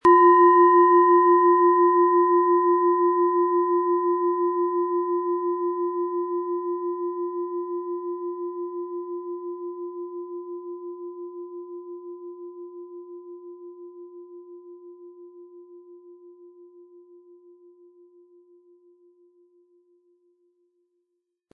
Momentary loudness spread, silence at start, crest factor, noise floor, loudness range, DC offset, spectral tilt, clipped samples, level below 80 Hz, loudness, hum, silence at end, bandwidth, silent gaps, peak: 25 LU; 0.05 s; 18 dB; -79 dBFS; 24 LU; under 0.1%; -7.5 dB/octave; under 0.1%; -74 dBFS; -21 LUFS; none; 5.25 s; 3 kHz; none; -6 dBFS